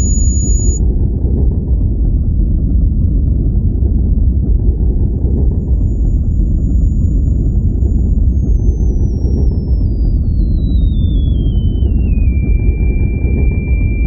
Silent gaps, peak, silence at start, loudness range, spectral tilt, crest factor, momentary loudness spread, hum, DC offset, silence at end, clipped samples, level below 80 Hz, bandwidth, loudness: none; -2 dBFS; 0 s; 0 LU; -7.5 dB/octave; 10 dB; 1 LU; none; under 0.1%; 0 s; under 0.1%; -12 dBFS; 7.2 kHz; -15 LUFS